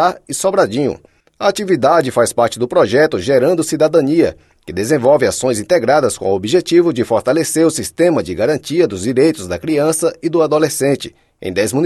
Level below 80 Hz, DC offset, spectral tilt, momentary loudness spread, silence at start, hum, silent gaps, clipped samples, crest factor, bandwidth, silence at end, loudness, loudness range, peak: -50 dBFS; under 0.1%; -5 dB/octave; 6 LU; 0 s; none; none; under 0.1%; 14 dB; 13 kHz; 0 s; -14 LUFS; 2 LU; 0 dBFS